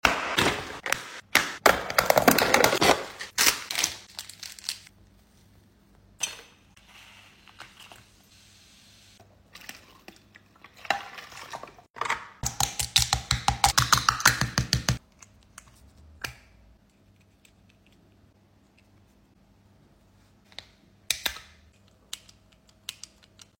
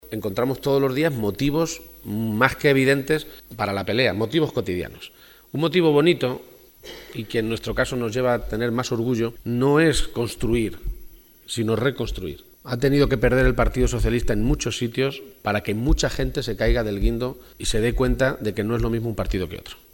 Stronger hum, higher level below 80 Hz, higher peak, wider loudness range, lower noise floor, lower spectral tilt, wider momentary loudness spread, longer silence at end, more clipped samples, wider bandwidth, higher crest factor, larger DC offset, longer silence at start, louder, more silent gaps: neither; second, -48 dBFS vs -32 dBFS; about the same, 0 dBFS vs 0 dBFS; first, 19 LU vs 3 LU; first, -61 dBFS vs -43 dBFS; second, -2 dB/octave vs -5.5 dB/octave; first, 25 LU vs 13 LU; first, 0.7 s vs 0.2 s; neither; second, 16.5 kHz vs 19 kHz; first, 30 dB vs 22 dB; neither; about the same, 0.05 s vs 0.05 s; about the same, -24 LUFS vs -23 LUFS; first, 11.90-11.94 s vs none